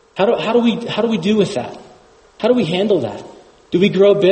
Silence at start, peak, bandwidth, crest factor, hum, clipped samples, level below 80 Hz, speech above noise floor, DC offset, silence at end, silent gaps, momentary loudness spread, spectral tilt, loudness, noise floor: 0.15 s; -2 dBFS; 8.8 kHz; 14 dB; none; under 0.1%; -56 dBFS; 32 dB; under 0.1%; 0 s; none; 12 LU; -6.5 dB/octave; -16 LUFS; -47 dBFS